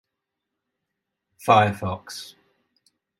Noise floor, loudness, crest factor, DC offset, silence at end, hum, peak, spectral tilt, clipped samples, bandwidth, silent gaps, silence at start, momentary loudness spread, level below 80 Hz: -83 dBFS; -21 LUFS; 24 dB; under 0.1%; 0.95 s; none; -2 dBFS; -5.5 dB/octave; under 0.1%; 16 kHz; none; 1.45 s; 19 LU; -68 dBFS